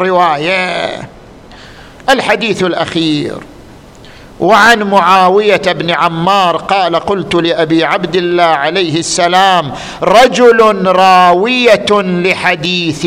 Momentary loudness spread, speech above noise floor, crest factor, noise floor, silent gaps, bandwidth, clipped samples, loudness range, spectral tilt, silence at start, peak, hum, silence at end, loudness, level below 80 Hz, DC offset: 8 LU; 25 dB; 10 dB; -34 dBFS; none; 16.5 kHz; 0.3%; 6 LU; -4 dB/octave; 0 s; 0 dBFS; none; 0 s; -9 LUFS; -44 dBFS; under 0.1%